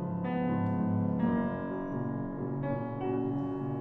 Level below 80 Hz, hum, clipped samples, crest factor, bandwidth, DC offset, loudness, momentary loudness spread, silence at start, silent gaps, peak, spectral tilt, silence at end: -54 dBFS; none; under 0.1%; 14 dB; 4 kHz; under 0.1%; -33 LUFS; 6 LU; 0 s; none; -18 dBFS; -11.5 dB/octave; 0 s